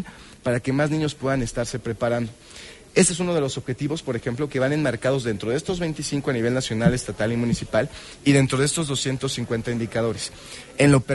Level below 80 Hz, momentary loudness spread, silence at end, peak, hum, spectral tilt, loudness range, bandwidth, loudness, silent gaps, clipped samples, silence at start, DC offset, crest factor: -46 dBFS; 10 LU; 0 s; -4 dBFS; none; -5 dB/octave; 2 LU; 11.5 kHz; -23 LUFS; none; under 0.1%; 0 s; under 0.1%; 20 dB